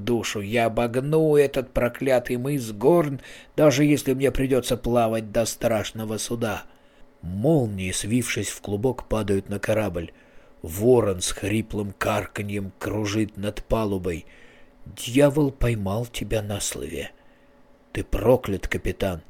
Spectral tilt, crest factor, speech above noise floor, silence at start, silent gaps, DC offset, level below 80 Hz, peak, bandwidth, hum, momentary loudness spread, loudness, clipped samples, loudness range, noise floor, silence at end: -5.5 dB/octave; 18 dB; 30 dB; 0 s; none; under 0.1%; -40 dBFS; -6 dBFS; 17.5 kHz; none; 12 LU; -24 LUFS; under 0.1%; 5 LU; -54 dBFS; 0.05 s